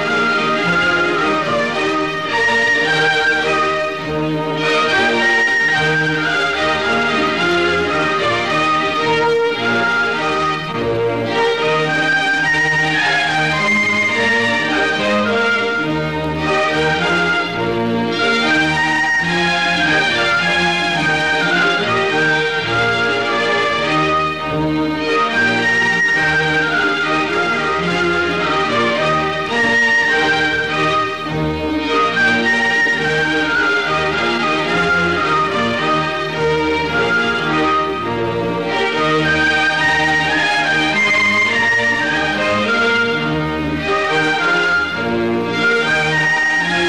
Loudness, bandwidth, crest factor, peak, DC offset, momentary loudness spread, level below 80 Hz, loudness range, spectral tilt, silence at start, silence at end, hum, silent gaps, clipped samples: -15 LUFS; 13.5 kHz; 10 dB; -6 dBFS; 0.6%; 5 LU; -44 dBFS; 2 LU; -4 dB/octave; 0 s; 0 s; none; none; under 0.1%